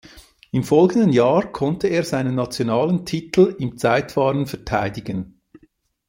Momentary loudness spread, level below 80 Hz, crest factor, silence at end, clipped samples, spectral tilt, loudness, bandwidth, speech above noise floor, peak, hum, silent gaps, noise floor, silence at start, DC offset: 10 LU; -50 dBFS; 18 dB; 0.85 s; under 0.1%; -6.5 dB/octave; -20 LUFS; 16.5 kHz; 40 dB; -2 dBFS; none; none; -59 dBFS; 0.15 s; under 0.1%